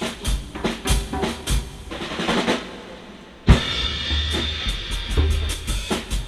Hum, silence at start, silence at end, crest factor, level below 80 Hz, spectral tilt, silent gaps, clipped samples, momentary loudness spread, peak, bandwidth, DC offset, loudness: none; 0 s; 0 s; 22 dB; -26 dBFS; -4.5 dB/octave; none; under 0.1%; 14 LU; 0 dBFS; 13 kHz; under 0.1%; -23 LUFS